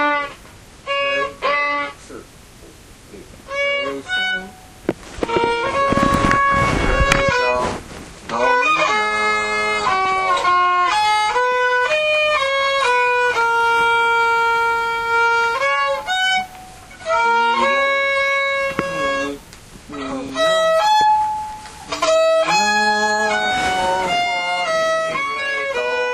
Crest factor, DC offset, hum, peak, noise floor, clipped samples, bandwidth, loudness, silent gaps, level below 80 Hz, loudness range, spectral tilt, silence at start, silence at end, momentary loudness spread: 18 dB; under 0.1%; none; 0 dBFS; -42 dBFS; under 0.1%; 15.5 kHz; -17 LUFS; none; -38 dBFS; 7 LU; -3 dB/octave; 0 s; 0 s; 12 LU